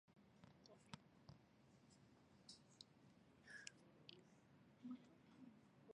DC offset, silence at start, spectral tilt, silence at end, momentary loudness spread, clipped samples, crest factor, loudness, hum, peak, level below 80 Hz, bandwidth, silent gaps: under 0.1%; 0.05 s; -4 dB/octave; 0 s; 10 LU; under 0.1%; 32 dB; -64 LUFS; none; -34 dBFS; -88 dBFS; 10 kHz; none